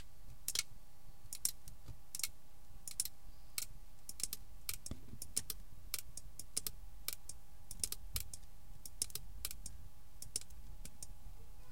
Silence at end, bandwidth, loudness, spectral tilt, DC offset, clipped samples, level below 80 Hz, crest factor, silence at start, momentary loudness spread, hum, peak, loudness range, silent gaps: 0 s; 17 kHz; -44 LUFS; -0.5 dB/octave; 0.7%; under 0.1%; -56 dBFS; 32 dB; 0 s; 19 LU; none; -14 dBFS; 2 LU; none